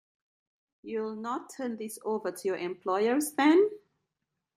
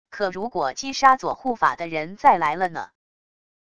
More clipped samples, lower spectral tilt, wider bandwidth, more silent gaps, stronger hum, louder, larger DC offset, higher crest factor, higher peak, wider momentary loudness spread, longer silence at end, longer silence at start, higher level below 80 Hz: neither; about the same, -4 dB/octave vs -3.5 dB/octave; first, 15.5 kHz vs 11 kHz; neither; neither; second, -30 LUFS vs -22 LUFS; second, under 0.1% vs 0.4%; about the same, 20 dB vs 22 dB; second, -12 dBFS vs -2 dBFS; about the same, 13 LU vs 11 LU; about the same, 0.8 s vs 0.75 s; first, 0.85 s vs 0.1 s; second, -82 dBFS vs -58 dBFS